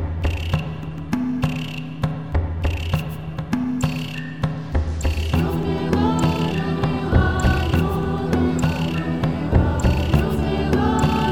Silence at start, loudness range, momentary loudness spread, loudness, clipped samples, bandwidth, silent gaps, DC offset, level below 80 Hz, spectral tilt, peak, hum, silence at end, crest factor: 0 s; 5 LU; 7 LU; -22 LUFS; under 0.1%; 17 kHz; none; 0.9%; -28 dBFS; -7 dB/octave; -2 dBFS; none; 0 s; 18 dB